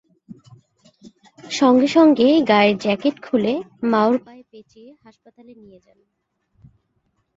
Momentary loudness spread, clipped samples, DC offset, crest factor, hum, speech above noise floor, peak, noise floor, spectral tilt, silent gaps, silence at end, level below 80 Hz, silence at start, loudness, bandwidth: 10 LU; under 0.1%; under 0.1%; 18 dB; none; 52 dB; -2 dBFS; -70 dBFS; -5.5 dB/octave; none; 2.75 s; -64 dBFS; 1.05 s; -17 LUFS; 8 kHz